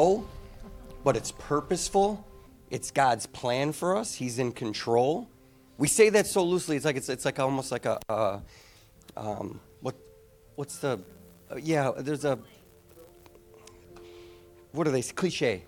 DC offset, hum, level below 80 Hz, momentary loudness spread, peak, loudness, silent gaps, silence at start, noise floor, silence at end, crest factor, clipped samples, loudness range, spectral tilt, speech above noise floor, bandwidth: under 0.1%; none; -54 dBFS; 16 LU; -8 dBFS; -28 LUFS; none; 0 s; -56 dBFS; 0.05 s; 22 dB; under 0.1%; 9 LU; -4.5 dB/octave; 28 dB; 18.5 kHz